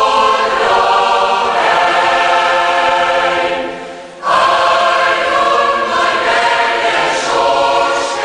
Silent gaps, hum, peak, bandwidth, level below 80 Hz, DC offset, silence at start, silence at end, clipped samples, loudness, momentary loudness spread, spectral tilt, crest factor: none; none; 0 dBFS; 10.5 kHz; -48 dBFS; under 0.1%; 0 s; 0 s; under 0.1%; -12 LUFS; 4 LU; -2 dB/octave; 12 dB